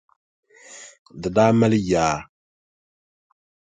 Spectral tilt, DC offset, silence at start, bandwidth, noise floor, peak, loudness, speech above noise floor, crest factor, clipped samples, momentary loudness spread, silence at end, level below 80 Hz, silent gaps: -6 dB/octave; under 0.1%; 0.7 s; 9.4 kHz; -45 dBFS; -4 dBFS; -20 LUFS; 26 dB; 20 dB; under 0.1%; 24 LU; 1.45 s; -50 dBFS; 0.99-1.06 s